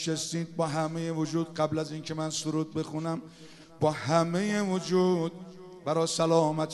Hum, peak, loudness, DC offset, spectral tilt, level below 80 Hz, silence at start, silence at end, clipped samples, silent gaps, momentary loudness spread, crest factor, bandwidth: none; -10 dBFS; -29 LUFS; under 0.1%; -5.5 dB/octave; -68 dBFS; 0 s; 0 s; under 0.1%; none; 10 LU; 20 dB; 12 kHz